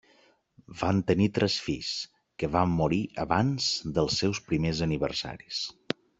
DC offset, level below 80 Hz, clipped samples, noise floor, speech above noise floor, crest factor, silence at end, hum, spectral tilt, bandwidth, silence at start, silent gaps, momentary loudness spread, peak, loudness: under 0.1%; -52 dBFS; under 0.1%; -63 dBFS; 36 dB; 22 dB; 0.5 s; none; -5 dB/octave; 8.2 kHz; 0.7 s; none; 9 LU; -6 dBFS; -28 LUFS